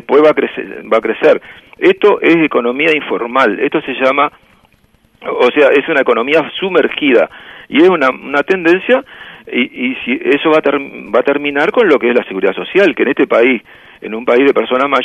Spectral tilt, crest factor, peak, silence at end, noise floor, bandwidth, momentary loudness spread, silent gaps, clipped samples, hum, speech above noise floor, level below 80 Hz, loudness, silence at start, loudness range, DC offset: -6 dB/octave; 12 dB; 0 dBFS; 0 s; -52 dBFS; 8.4 kHz; 8 LU; none; under 0.1%; none; 40 dB; -56 dBFS; -12 LUFS; 0.1 s; 2 LU; under 0.1%